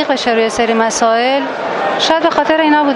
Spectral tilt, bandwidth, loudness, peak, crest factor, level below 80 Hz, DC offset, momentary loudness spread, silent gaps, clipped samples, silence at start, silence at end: -2.5 dB/octave; 11.5 kHz; -13 LUFS; 0 dBFS; 12 dB; -50 dBFS; under 0.1%; 5 LU; none; under 0.1%; 0 s; 0 s